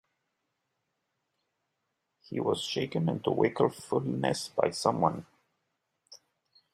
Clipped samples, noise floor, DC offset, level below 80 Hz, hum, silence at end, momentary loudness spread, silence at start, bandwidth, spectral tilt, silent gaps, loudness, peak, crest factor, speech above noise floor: under 0.1%; -82 dBFS; under 0.1%; -70 dBFS; none; 0.6 s; 5 LU; 2.3 s; 15 kHz; -5.5 dB/octave; none; -30 LUFS; -10 dBFS; 22 dB; 53 dB